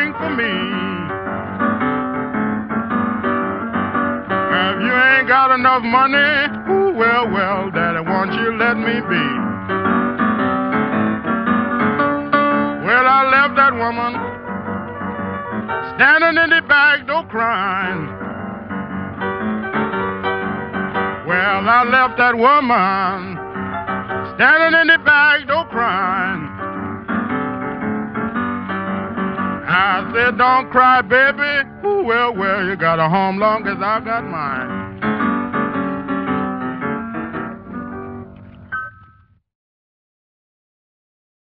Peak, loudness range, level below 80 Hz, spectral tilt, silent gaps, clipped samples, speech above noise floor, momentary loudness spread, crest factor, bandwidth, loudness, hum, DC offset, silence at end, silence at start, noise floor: 0 dBFS; 8 LU; -50 dBFS; -2.5 dB/octave; none; under 0.1%; 36 dB; 14 LU; 18 dB; 5.8 kHz; -16 LUFS; none; under 0.1%; 2.55 s; 0 s; -51 dBFS